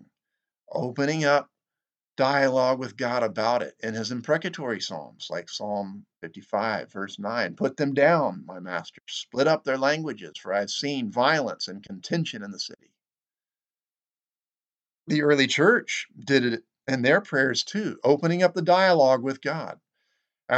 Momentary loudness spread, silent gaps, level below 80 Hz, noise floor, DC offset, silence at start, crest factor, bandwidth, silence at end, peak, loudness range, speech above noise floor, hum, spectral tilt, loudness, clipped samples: 14 LU; none; -80 dBFS; under -90 dBFS; under 0.1%; 0.7 s; 20 dB; 8.8 kHz; 0 s; -4 dBFS; 8 LU; over 65 dB; none; -4.5 dB/octave; -25 LUFS; under 0.1%